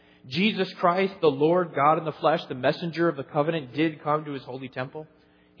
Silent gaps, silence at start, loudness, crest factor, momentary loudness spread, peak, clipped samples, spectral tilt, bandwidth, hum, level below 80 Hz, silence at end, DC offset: none; 0.25 s; -25 LUFS; 20 dB; 13 LU; -6 dBFS; under 0.1%; -7.5 dB/octave; 5.4 kHz; none; -72 dBFS; 0.55 s; under 0.1%